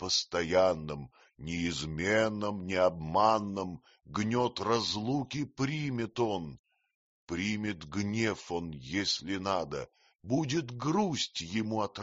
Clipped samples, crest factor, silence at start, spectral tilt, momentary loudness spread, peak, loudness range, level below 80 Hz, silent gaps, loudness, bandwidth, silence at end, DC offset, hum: under 0.1%; 20 dB; 0 s; -4 dB/octave; 12 LU; -12 dBFS; 4 LU; -60 dBFS; 6.59-6.64 s, 6.95-7.27 s; -32 LUFS; 8 kHz; 0 s; under 0.1%; none